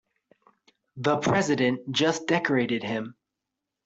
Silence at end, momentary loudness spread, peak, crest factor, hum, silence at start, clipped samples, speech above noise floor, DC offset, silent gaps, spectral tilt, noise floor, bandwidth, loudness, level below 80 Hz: 0.75 s; 8 LU; -8 dBFS; 20 dB; none; 0.95 s; under 0.1%; 60 dB; under 0.1%; none; -5 dB/octave; -85 dBFS; 8.2 kHz; -25 LUFS; -66 dBFS